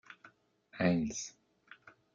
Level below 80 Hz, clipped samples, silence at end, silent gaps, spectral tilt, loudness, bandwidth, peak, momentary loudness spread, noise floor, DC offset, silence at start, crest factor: -66 dBFS; under 0.1%; 0.25 s; none; -5.5 dB/octave; -35 LUFS; 7.6 kHz; -16 dBFS; 26 LU; -63 dBFS; under 0.1%; 0.1 s; 22 dB